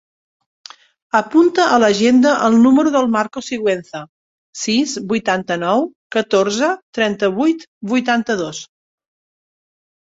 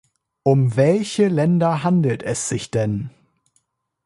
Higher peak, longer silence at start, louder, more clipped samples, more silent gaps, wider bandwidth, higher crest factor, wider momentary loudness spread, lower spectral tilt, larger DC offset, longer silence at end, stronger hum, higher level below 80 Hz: about the same, -2 dBFS vs -4 dBFS; first, 1.15 s vs 0.45 s; first, -16 LUFS vs -19 LUFS; neither; first, 4.09-4.53 s, 5.96-6.10 s, 6.83-6.93 s, 7.67-7.81 s vs none; second, 8 kHz vs 11.5 kHz; about the same, 16 dB vs 16 dB; first, 11 LU vs 7 LU; second, -4.5 dB/octave vs -6.5 dB/octave; neither; first, 1.55 s vs 0.95 s; neither; second, -60 dBFS vs -54 dBFS